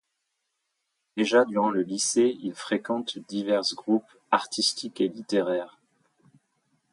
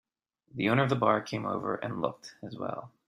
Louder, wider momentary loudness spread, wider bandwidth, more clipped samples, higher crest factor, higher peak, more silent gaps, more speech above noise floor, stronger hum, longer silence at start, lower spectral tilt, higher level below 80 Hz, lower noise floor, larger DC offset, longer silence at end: first, -26 LUFS vs -30 LUFS; second, 9 LU vs 16 LU; about the same, 11.5 kHz vs 12.5 kHz; neither; about the same, 22 dB vs 22 dB; first, -6 dBFS vs -10 dBFS; neither; first, 54 dB vs 39 dB; neither; first, 1.15 s vs 0.55 s; second, -3 dB/octave vs -6.5 dB/octave; second, -78 dBFS vs -68 dBFS; first, -79 dBFS vs -70 dBFS; neither; first, 1.25 s vs 0.2 s